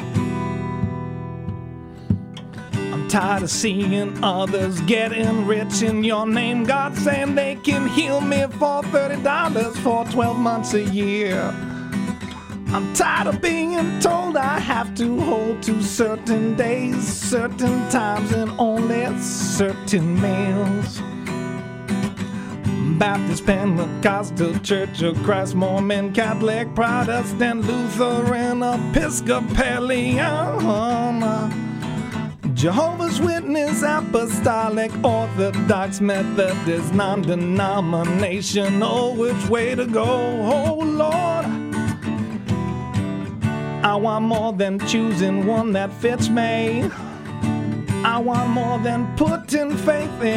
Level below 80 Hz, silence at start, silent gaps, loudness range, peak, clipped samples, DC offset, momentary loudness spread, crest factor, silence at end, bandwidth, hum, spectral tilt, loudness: -44 dBFS; 0 s; none; 3 LU; -2 dBFS; under 0.1%; under 0.1%; 7 LU; 18 dB; 0 s; 16 kHz; none; -5.5 dB/octave; -21 LUFS